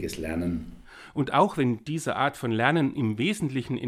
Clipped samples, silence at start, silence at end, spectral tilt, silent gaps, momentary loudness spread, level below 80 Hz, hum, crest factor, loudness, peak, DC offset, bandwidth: under 0.1%; 0 s; 0 s; -6 dB/octave; none; 8 LU; -52 dBFS; none; 22 dB; -27 LUFS; -6 dBFS; under 0.1%; 15.5 kHz